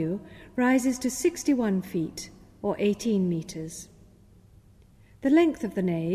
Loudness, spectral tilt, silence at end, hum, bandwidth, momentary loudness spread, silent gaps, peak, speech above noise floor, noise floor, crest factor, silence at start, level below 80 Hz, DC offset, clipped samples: -27 LUFS; -5.5 dB/octave; 0 s; none; 15 kHz; 15 LU; none; -10 dBFS; 29 dB; -55 dBFS; 16 dB; 0 s; -58 dBFS; under 0.1%; under 0.1%